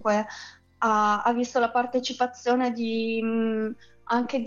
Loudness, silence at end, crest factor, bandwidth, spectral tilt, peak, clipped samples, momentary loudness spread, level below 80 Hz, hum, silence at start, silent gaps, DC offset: -26 LUFS; 0 s; 14 dB; 7.6 kHz; -4.5 dB/octave; -10 dBFS; under 0.1%; 11 LU; -68 dBFS; none; 0 s; none; under 0.1%